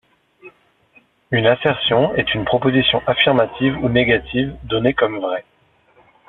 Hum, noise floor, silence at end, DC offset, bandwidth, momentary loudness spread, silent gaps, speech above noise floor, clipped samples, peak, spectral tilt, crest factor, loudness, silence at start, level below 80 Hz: none; -55 dBFS; 0.85 s; under 0.1%; 4.2 kHz; 7 LU; none; 38 dB; under 0.1%; 0 dBFS; -8.5 dB/octave; 18 dB; -17 LUFS; 0.45 s; -44 dBFS